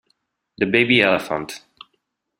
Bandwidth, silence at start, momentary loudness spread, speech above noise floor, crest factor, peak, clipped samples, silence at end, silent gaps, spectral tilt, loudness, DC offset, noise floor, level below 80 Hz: 16 kHz; 0.6 s; 18 LU; 54 dB; 20 dB; -2 dBFS; under 0.1%; 0.8 s; none; -5 dB/octave; -18 LUFS; under 0.1%; -72 dBFS; -58 dBFS